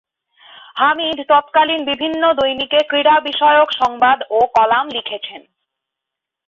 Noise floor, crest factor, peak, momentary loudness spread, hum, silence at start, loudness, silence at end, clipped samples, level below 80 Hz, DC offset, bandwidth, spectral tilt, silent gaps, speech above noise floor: -82 dBFS; 14 dB; -2 dBFS; 10 LU; none; 0.75 s; -15 LUFS; 1.1 s; under 0.1%; -58 dBFS; under 0.1%; 7.2 kHz; -4 dB/octave; none; 68 dB